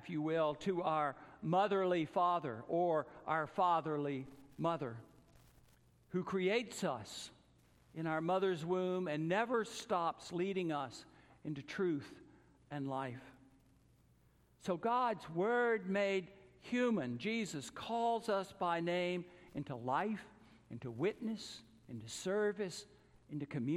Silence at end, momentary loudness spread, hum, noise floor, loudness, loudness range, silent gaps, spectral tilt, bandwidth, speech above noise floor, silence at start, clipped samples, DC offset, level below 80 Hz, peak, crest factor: 0 s; 14 LU; none; -70 dBFS; -38 LUFS; 6 LU; none; -5.5 dB/octave; 14 kHz; 32 dB; 0 s; under 0.1%; under 0.1%; -74 dBFS; -20 dBFS; 18 dB